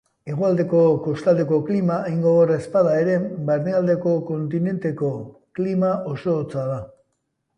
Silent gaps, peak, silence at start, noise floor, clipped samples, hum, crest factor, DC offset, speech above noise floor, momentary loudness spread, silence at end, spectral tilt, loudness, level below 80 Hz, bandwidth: none; -6 dBFS; 0.25 s; -74 dBFS; under 0.1%; none; 14 dB; under 0.1%; 53 dB; 9 LU; 0.7 s; -9.5 dB/octave; -21 LUFS; -60 dBFS; 10 kHz